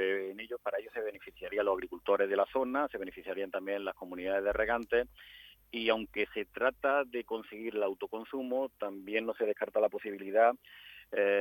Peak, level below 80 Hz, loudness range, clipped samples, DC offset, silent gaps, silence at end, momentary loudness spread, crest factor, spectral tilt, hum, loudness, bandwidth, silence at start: -14 dBFS; -62 dBFS; 2 LU; under 0.1%; under 0.1%; none; 0 s; 11 LU; 20 dB; -5.5 dB/octave; none; -34 LUFS; 18 kHz; 0 s